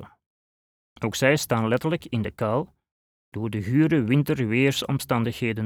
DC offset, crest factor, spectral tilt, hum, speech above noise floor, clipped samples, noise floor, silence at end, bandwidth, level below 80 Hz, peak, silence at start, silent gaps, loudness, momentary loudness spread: under 0.1%; 18 dB; -6 dB/octave; none; over 67 dB; under 0.1%; under -90 dBFS; 0 s; 18.5 kHz; -58 dBFS; -6 dBFS; 0 s; 0.26-0.96 s, 2.91-3.32 s; -24 LUFS; 10 LU